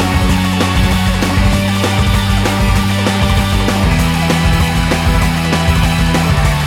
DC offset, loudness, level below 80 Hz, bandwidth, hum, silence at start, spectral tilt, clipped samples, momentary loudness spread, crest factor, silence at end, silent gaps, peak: under 0.1%; -13 LUFS; -18 dBFS; 17 kHz; none; 0 s; -5 dB/octave; under 0.1%; 1 LU; 10 dB; 0 s; none; 0 dBFS